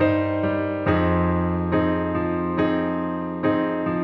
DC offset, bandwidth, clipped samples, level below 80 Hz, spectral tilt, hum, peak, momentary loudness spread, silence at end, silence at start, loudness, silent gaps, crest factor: under 0.1%; 5.2 kHz; under 0.1%; -42 dBFS; -10 dB/octave; none; -8 dBFS; 4 LU; 0 s; 0 s; -23 LUFS; none; 14 dB